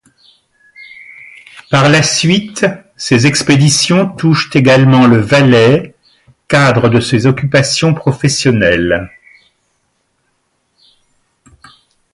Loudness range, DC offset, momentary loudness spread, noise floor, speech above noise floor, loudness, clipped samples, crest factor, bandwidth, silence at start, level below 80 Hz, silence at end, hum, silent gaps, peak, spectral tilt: 7 LU; under 0.1%; 9 LU; -62 dBFS; 53 dB; -10 LUFS; under 0.1%; 12 dB; 11.5 kHz; 0.8 s; -42 dBFS; 3.05 s; none; none; 0 dBFS; -5 dB/octave